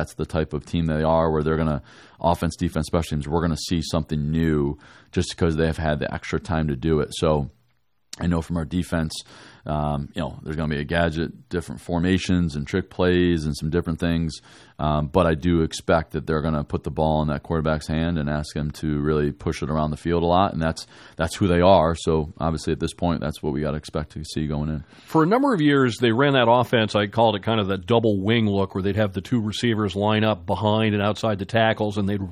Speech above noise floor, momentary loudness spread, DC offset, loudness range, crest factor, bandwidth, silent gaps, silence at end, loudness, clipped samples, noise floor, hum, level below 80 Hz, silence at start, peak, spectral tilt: 47 dB; 9 LU; under 0.1%; 6 LU; 20 dB; 14.5 kHz; none; 0 s; -23 LUFS; under 0.1%; -69 dBFS; none; -40 dBFS; 0 s; -2 dBFS; -6.5 dB/octave